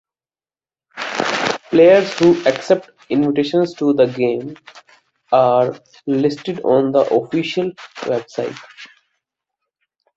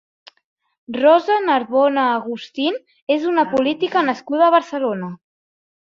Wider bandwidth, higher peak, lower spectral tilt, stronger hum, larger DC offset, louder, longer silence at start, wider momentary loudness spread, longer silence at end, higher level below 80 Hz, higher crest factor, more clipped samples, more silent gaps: about the same, 8 kHz vs 7.4 kHz; about the same, -2 dBFS vs -2 dBFS; about the same, -6 dB/octave vs -6 dB/octave; neither; neither; about the same, -17 LUFS vs -18 LUFS; about the same, 0.95 s vs 0.9 s; about the same, 13 LU vs 12 LU; first, 1.3 s vs 0.7 s; about the same, -62 dBFS vs -66 dBFS; about the same, 16 dB vs 16 dB; neither; second, none vs 3.02-3.07 s